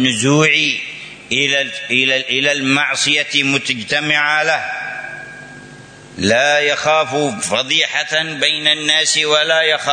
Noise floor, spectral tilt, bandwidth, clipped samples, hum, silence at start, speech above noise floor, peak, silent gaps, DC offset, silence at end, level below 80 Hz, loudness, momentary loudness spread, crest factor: -38 dBFS; -2.5 dB/octave; 9.6 kHz; under 0.1%; none; 0 s; 22 dB; 0 dBFS; none; under 0.1%; 0 s; -58 dBFS; -14 LUFS; 11 LU; 16 dB